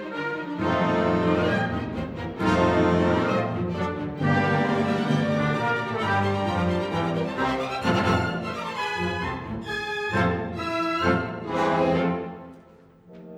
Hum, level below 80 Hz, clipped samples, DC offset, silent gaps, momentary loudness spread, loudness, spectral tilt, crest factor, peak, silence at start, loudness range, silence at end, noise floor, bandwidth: none; -52 dBFS; under 0.1%; under 0.1%; none; 8 LU; -25 LUFS; -6.5 dB/octave; 16 dB; -8 dBFS; 0 s; 3 LU; 0 s; -52 dBFS; 12 kHz